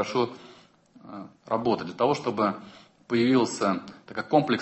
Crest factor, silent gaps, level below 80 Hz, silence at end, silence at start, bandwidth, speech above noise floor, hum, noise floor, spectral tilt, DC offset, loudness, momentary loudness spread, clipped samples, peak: 20 dB; none; -66 dBFS; 0 s; 0 s; 8.4 kHz; 29 dB; none; -55 dBFS; -5.5 dB/octave; under 0.1%; -26 LUFS; 20 LU; under 0.1%; -6 dBFS